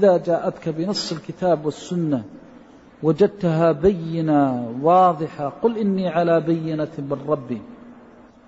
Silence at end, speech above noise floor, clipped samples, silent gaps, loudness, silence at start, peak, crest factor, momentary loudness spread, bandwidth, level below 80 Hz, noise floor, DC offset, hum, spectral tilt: 0.5 s; 27 dB; under 0.1%; none; -21 LUFS; 0 s; -4 dBFS; 16 dB; 9 LU; 8 kHz; -52 dBFS; -47 dBFS; under 0.1%; none; -7 dB/octave